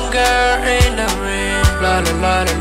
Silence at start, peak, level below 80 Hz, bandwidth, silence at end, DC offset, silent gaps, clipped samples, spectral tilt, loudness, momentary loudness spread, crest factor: 0 s; -2 dBFS; -22 dBFS; 16.5 kHz; 0 s; under 0.1%; none; under 0.1%; -4 dB/octave; -15 LUFS; 5 LU; 12 dB